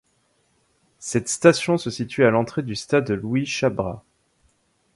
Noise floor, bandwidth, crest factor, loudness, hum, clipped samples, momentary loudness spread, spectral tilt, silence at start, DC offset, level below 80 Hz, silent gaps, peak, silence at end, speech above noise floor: -66 dBFS; 11.5 kHz; 22 dB; -21 LUFS; none; under 0.1%; 11 LU; -5 dB/octave; 1 s; under 0.1%; -54 dBFS; none; 0 dBFS; 0.95 s; 45 dB